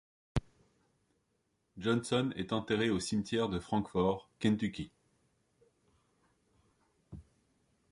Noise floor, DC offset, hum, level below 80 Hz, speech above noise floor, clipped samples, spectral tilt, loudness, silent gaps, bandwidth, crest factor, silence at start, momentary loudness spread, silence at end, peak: -79 dBFS; under 0.1%; none; -56 dBFS; 46 dB; under 0.1%; -5.5 dB/octave; -34 LUFS; none; 11.5 kHz; 20 dB; 0.35 s; 16 LU; 0.7 s; -16 dBFS